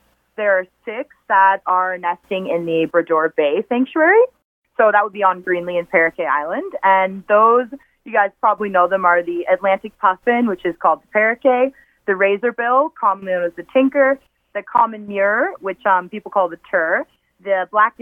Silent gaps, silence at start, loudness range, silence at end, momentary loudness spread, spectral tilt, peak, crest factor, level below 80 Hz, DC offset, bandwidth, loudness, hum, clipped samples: 4.44-4.62 s; 0.4 s; 2 LU; 0.1 s; 8 LU; -7.5 dB/octave; 0 dBFS; 16 dB; -64 dBFS; under 0.1%; 3.8 kHz; -17 LUFS; none; under 0.1%